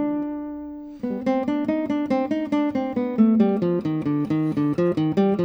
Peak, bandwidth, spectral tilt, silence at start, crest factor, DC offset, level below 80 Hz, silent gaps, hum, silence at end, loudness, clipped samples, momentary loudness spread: -8 dBFS; 6.4 kHz; -9 dB/octave; 0 s; 16 dB; under 0.1%; -58 dBFS; none; none; 0 s; -23 LUFS; under 0.1%; 11 LU